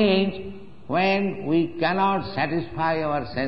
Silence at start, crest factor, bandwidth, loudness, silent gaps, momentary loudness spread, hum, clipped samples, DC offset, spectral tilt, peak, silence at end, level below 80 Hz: 0 s; 18 dB; 6 kHz; -24 LUFS; none; 6 LU; none; under 0.1%; 0.9%; -8.5 dB/octave; -6 dBFS; 0 s; -52 dBFS